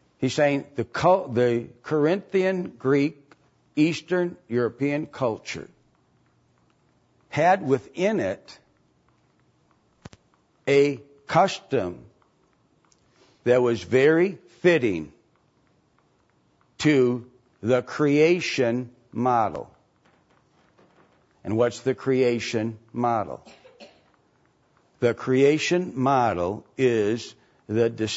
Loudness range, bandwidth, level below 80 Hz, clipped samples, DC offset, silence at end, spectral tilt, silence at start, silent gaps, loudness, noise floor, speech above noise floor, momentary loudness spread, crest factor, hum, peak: 5 LU; 8 kHz; -64 dBFS; under 0.1%; under 0.1%; 0 s; -6 dB/octave; 0.2 s; none; -24 LUFS; -65 dBFS; 42 dB; 13 LU; 18 dB; none; -6 dBFS